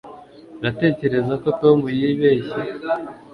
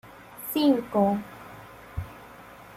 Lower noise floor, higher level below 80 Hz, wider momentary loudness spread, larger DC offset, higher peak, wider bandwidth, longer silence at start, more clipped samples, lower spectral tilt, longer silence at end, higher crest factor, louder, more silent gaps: second, -41 dBFS vs -47 dBFS; about the same, -54 dBFS vs -54 dBFS; second, 10 LU vs 23 LU; neither; first, -2 dBFS vs -12 dBFS; second, 5.4 kHz vs 16.5 kHz; about the same, 0.05 s vs 0.05 s; neither; first, -9 dB/octave vs -6 dB/octave; first, 0.15 s vs 0 s; about the same, 18 dB vs 18 dB; first, -20 LUFS vs -25 LUFS; neither